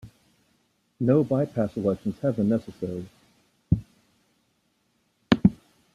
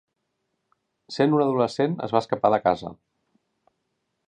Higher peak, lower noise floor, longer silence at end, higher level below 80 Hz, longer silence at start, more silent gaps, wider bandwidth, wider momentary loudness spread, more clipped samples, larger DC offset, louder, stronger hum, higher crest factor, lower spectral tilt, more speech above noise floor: about the same, -4 dBFS vs -6 dBFS; second, -70 dBFS vs -77 dBFS; second, 0.4 s vs 1.35 s; first, -50 dBFS vs -64 dBFS; second, 0.05 s vs 1.1 s; neither; about the same, 10.5 kHz vs 9.8 kHz; first, 12 LU vs 9 LU; neither; neither; second, -26 LUFS vs -23 LUFS; neither; about the same, 24 dB vs 20 dB; first, -8.5 dB/octave vs -7 dB/octave; second, 46 dB vs 55 dB